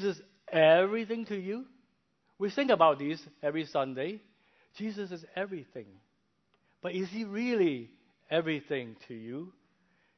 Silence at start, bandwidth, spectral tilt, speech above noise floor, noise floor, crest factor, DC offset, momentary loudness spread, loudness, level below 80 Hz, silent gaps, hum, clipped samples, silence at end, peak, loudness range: 0 s; 6.4 kHz; -6.5 dB/octave; 44 dB; -75 dBFS; 22 dB; under 0.1%; 19 LU; -31 LUFS; -80 dBFS; none; none; under 0.1%; 0.65 s; -10 dBFS; 10 LU